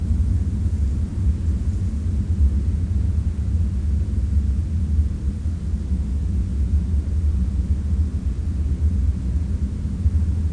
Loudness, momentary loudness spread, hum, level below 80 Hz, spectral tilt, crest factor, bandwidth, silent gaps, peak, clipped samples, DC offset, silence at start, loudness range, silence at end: -23 LUFS; 4 LU; none; -22 dBFS; -9 dB/octave; 12 dB; 9.6 kHz; none; -8 dBFS; under 0.1%; 0.3%; 0 s; 1 LU; 0 s